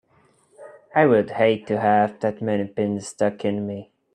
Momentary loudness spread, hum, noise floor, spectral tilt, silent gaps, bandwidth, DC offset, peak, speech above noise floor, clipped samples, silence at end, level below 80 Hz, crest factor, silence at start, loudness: 8 LU; none; -60 dBFS; -6.5 dB/octave; none; 10.5 kHz; under 0.1%; -4 dBFS; 39 dB; under 0.1%; 0.3 s; -64 dBFS; 18 dB; 0.6 s; -22 LUFS